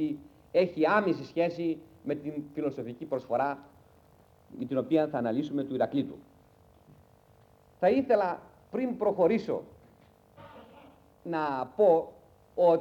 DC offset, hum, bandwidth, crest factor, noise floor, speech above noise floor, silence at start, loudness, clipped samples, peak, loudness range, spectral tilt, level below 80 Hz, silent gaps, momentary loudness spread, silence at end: under 0.1%; none; 7.4 kHz; 18 dB; -60 dBFS; 32 dB; 0 s; -29 LUFS; under 0.1%; -12 dBFS; 3 LU; -8 dB/octave; -68 dBFS; none; 16 LU; 0 s